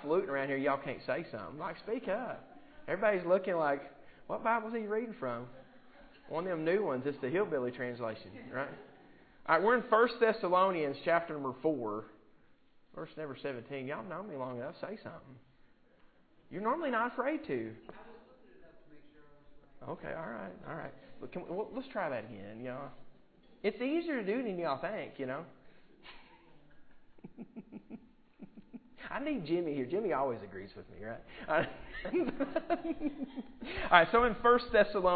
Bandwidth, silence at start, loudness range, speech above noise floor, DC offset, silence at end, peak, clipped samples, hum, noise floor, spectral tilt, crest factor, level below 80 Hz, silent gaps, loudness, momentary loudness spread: 4.8 kHz; 0 s; 13 LU; 29 dB; under 0.1%; 0 s; -6 dBFS; under 0.1%; none; -63 dBFS; -3.5 dB/octave; 30 dB; -62 dBFS; none; -34 LUFS; 22 LU